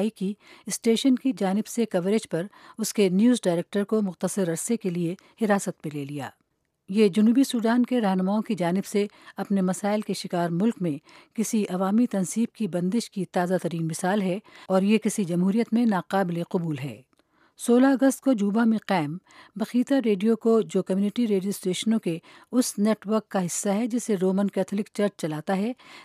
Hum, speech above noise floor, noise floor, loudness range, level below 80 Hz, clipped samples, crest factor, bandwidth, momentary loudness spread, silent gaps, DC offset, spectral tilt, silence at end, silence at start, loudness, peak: none; 39 dB; -63 dBFS; 3 LU; -78 dBFS; under 0.1%; 16 dB; 15.5 kHz; 10 LU; none; under 0.1%; -5.5 dB/octave; 0 s; 0 s; -25 LUFS; -8 dBFS